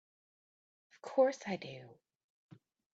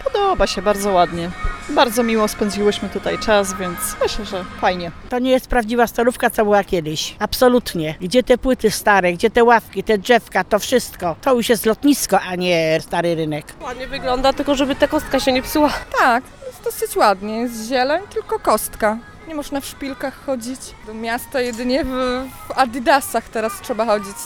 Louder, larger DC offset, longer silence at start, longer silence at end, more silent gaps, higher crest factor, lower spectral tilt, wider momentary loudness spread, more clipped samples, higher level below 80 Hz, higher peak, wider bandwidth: second, -35 LUFS vs -18 LUFS; neither; first, 1.05 s vs 0 s; first, 1 s vs 0 s; neither; about the same, 22 dB vs 18 dB; first, -5.5 dB/octave vs -4 dB/octave; first, 21 LU vs 11 LU; neither; second, -84 dBFS vs -38 dBFS; second, -18 dBFS vs 0 dBFS; second, 8 kHz vs over 20 kHz